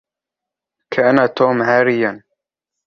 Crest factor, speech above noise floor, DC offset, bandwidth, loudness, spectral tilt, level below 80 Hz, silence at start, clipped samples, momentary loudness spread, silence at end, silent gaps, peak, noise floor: 18 dB; 71 dB; under 0.1%; 6.8 kHz; -15 LUFS; -7 dB/octave; -62 dBFS; 0.9 s; under 0.1%; 7 LU; 0.7 s; none; 0 dBFS; -85 dBFS